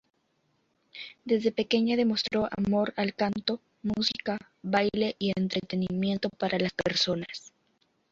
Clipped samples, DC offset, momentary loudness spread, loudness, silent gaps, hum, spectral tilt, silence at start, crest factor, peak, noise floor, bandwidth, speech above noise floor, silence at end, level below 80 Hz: under 0.1%; under 0.1%; 9 LU; -28 LUFS; none; none; -5.5 dB/octave; 0.95 s; 20 dB; -10 dBFS; -73 dBFS; 7.6 kHz; 44 dB; 0.65 s; -62 dBFS